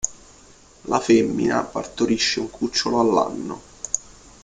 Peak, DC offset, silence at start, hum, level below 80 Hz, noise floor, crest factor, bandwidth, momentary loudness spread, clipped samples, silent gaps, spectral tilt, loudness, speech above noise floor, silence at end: -2 dBFS; under 0.1%; 0.05 s; none; -52 dBFS; -50 dBFS; 20 dB; 9.6 kHz; 13 LU; under 0.1%; none; -3.5 dB/octave; -22 LUFS; 29 dB; 0.45 s